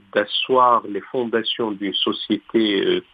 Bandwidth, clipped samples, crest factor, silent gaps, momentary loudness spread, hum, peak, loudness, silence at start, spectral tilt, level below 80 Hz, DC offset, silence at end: 5 kHz; under 0.1%; 18 dB; none; 8 LU; none; -4 dBFS; -20 LUFS; 0.15 s; -7 dB/octave; -68 dBFS; under 0.1%; 0.1 s